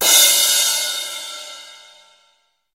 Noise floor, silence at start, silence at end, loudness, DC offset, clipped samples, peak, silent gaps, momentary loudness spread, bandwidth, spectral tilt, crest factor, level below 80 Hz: -62 dBFS; 0 s; 1 s; -13 LUFS; under 0.1%; under 0.1%; 0 dBFS; none; 23 LU; 16 kHz; 3.5 dB/octave; 20 dB; -68 dBFS